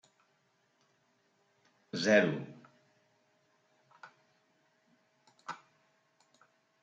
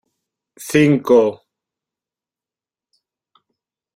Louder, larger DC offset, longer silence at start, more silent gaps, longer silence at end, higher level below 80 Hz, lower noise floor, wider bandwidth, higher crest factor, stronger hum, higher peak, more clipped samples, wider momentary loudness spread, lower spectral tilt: second, -30 LUFS vs -15 LUFS; neither; first, 1.95 s vs 0.6 s; neither; second, 1.3 s vs 2.6 s; second, -86 dBFS vs -60 dBFS; second, -74 dBFS vs under -90 dBFS; second, 9 kHz vs 16 kHz; first, 26 dB vs 20 dB; neither; second, -14 dBFS vs -2 dBFS; neither; first, 23 LU vs 10 LU; second, -5 dB/octave vs -6.5 dB/octave